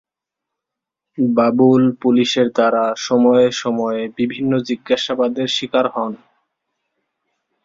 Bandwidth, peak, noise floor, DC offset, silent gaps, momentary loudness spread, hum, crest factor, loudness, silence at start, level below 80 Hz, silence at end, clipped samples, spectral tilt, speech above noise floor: 7.6 kHz; -2 dBFS; -83 dBFS; under 0.1%; none; 9 LU; none; 16 dB; -17 LUFS; 1.2 s; -60 dBFS; 1.5 s; under 0.1%; -5.5 dB/octave; 67 dB